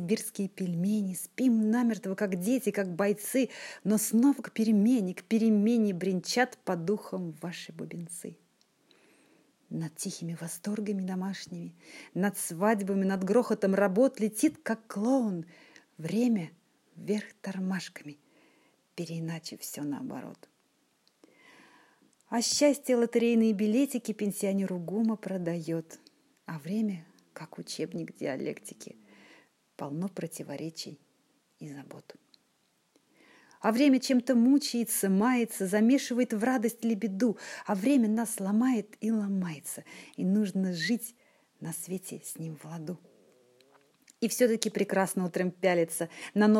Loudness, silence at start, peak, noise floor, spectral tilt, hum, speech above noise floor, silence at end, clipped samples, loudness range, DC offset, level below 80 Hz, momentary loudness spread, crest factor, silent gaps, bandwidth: -30 LUFS; 0 s; -6 dBFS; -72 dBFS; -5 dB/octave; none; 43 dB; 0 s; under 0.1%; 13 LU; under 0.1%; -82 dBFS; 17 LU; 24 dB; none; 16 kHz